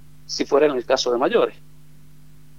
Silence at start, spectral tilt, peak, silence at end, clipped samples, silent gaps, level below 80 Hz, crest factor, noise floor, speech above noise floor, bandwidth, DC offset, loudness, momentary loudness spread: 0.3 s; -3.5 dB/octave; -4 dBFS; 1.1 s; under 0.1%; none; -58 dBFS; 18 dB; -50 dBFS; 30 dB; 15.5 kHz; 0.8%; -20 LUFS; 8 LU